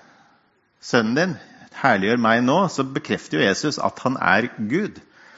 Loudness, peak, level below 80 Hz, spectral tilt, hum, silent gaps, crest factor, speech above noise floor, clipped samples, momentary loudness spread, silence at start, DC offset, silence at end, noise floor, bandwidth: -21 LUFS; 0 dBFS; -60 dBFS; -5 dB/octave; none; none; 20 dB; 41 dB; under 0.1%; 8 LU; 0.85 s; under 0.1%; 0.4 s; -61 dBFS; 8 kHz